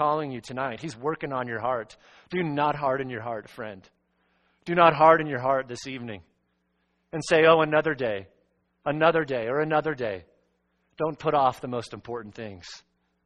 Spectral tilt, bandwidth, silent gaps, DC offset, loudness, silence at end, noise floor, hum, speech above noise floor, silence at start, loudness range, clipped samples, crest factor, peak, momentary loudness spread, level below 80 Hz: -5.5 dB/octave; 9.4 kHz; none; under 0.1%; -25 LUFS; 0.45 s; -73 dBFS; none; 48 dB; 0 s; 7 LU; under 0.1%; 24 dB; -2 dBFS; 20 LU; -62 dBFS